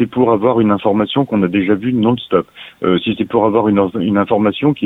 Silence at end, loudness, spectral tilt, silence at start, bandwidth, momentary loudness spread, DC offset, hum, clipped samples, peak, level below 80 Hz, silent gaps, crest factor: 0 s; -15 LUFS; -9 dB/octave; 0 s; 4 kHz; 4 LU; under 0.1%; none; under 0.1%; 0 dBFS; -50 dBFS; none; 14 dB